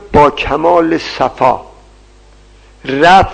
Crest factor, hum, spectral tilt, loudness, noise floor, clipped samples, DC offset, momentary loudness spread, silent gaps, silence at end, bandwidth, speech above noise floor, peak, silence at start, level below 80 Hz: 12 dB; 50 Hz at -40 dBFS; -5.5 dB/octave; -11 LUFS; -41 dBFS; 0.8%; under 0.1%; 13 LU; none; 0 s; 9.2 kHz; 31 dB; 0 dBFS; 0 s; -32 dBFS